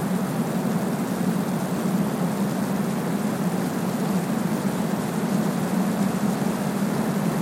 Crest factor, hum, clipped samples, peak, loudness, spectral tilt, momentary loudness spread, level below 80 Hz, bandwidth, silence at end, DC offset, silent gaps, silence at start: 12 dB; none; under 0.1%; -12 dBFS; -25 LUFS; -6.5 dB/octave; 2 LU; -58 dBFS; 16.5 kHz; 0 s; under 0.1%; none; 0 s